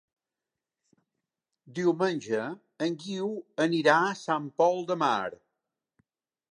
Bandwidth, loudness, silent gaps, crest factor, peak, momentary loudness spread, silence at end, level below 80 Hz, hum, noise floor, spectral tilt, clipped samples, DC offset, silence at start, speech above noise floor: 10.5 kHz; -28 LUFS; none; 22 dB; -8 dBFS; 10 LU; 1.15 s; -82 dBFS; none; -89 dBFS; -5 dB/octave; under 0.1%; under 0.1%; 1.65 s; 62 dB